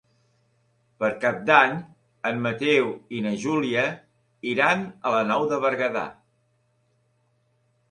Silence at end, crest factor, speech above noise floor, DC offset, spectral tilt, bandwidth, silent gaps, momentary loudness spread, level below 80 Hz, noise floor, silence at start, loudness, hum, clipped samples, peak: 1.8 s; 24 dB; 45 dB; under 0.1%; -5.5 dB/octave; 10.5 kHz; none; 13 LU; -68 dBFS; -68 dBFS; 1 s; -23 LUFS; none; under 0.1%; -2 dBFS